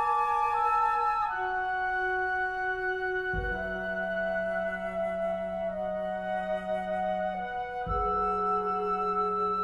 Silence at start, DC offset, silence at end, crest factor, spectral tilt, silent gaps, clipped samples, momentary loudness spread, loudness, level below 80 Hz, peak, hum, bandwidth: 0 s; under 0.1%; 0 s; 14 dB; -6.5 dB/octave; none; under 0.1%; 6 LU; -30 LUFS; -48 dBFS; -16 dBFS; none; 12.5 kHz